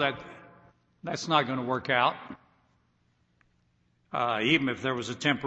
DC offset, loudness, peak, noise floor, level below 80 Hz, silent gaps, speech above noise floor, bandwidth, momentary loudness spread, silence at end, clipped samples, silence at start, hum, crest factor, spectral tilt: under 0.1%; -28 LUFS; -8 dBFS; -70 dBFS; -68 dBFS; none; 42 dB; 8.4 kHz; 18 LU; 0 s; under 0.1%; 0 s; none; 22 dB; -4.5 dB/octave